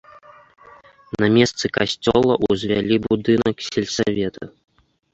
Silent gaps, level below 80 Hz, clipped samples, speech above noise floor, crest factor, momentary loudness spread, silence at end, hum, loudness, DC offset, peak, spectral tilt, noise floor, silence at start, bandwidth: none; -48 dBFS; under 0.1%; 29 dB; 18 dB; 9 LU; 0.65 s; none; -19 LUFS; under 0.1%; -2 dBFS; -5 dB/octave; -47 dBFS; 1.2 s; 8.2 kHz